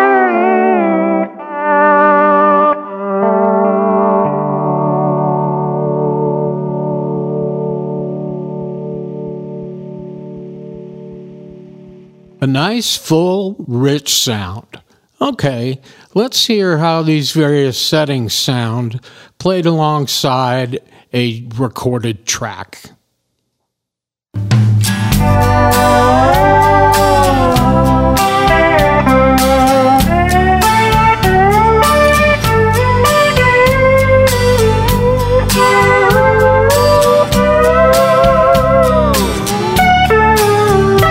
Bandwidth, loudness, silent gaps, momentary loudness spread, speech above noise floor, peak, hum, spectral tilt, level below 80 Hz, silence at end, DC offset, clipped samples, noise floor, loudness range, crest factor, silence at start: 16.5 kHz; -11 LUFS; none; 13 LU; 68 dB; 0 dBFS; none; -5 dB/octave; -26 dBFS; 0 s; under 0.1%; under 0.1%; -83 dBFS; 11 LU; 12 dB; 0 s